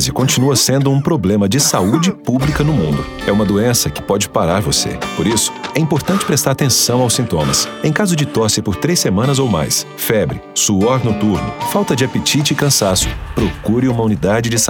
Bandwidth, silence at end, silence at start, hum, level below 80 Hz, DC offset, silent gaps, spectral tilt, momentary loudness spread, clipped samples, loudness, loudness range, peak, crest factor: over 20 kHz; 0 s; 0 s; none; -34 dBFS; under 0.1%; none; -4 dB/octave; 5 LU; under 0.1%; -14 LUFS; 1 LU; 0 dBFS; 14 dB